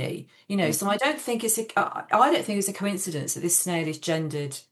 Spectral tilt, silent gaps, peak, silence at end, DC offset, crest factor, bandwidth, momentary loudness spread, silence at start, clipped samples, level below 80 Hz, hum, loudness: -3.5 dB/octave; none; -6 dBFS; 0.1 s; under 0.1%; 20 dB; 13 kHz; 9 LU; 0 s; under 0.1%; -84 dBFS; none; -25 LUFS